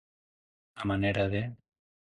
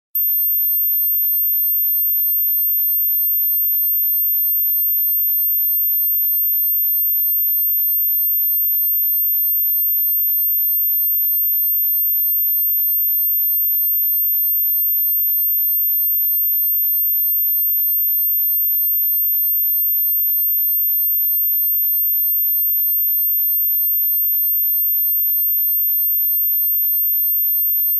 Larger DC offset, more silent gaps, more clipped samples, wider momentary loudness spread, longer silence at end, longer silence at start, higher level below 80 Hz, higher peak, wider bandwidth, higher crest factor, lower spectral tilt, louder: neither; neither; neither; first, 9 LU vs 0 LU; first, 0.6 s vs 0 s; first, 0.75 s vs 0.15 s; first, -52 dBFS vs under -90 dBFS; about the same, -14 dBFS vs -14 dBFS; second, 10.5 kHz vs 14.5 kHz; first, 18 dB vs 4 dB; first, -7.5 dB/octave vs 0.5 dB/octave; second, -31 LUFS vs -14 LUFS